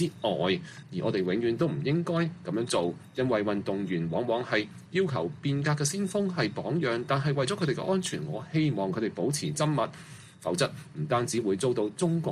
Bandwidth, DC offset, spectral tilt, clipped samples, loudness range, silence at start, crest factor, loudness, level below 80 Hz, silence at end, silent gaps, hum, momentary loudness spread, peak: 14 kHz; under 0.1%; -5.5 dB/octave; under 0.1%; 1 LU; 0 s; 16 dB; -29 LUFS; -64 dBFS; 0 s; none; none; 5 LU; -12 dBFS